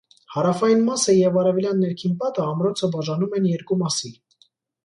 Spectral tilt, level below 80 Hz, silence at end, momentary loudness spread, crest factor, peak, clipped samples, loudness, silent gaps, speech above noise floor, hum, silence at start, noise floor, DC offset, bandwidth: -5.5 dB/octave; -66 dBFS; 0.75 s; 7 LU; 16 dB; -6 dBFS; under 0.1%; -21 LUFS; none; 41 dB; none; 0.3 s; -62 dBFS; under 0.1%; 11 kHz